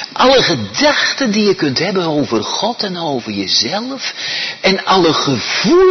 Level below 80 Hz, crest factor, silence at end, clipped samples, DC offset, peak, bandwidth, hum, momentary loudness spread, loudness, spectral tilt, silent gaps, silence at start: -48 dBFS; 14 dB; 0 s; under 0.1%; under 0.1%; 0 dBFS; 6.4 kHz; none; 9 LU; -14 LUFS; -3.5 dB/octave; none; 0 s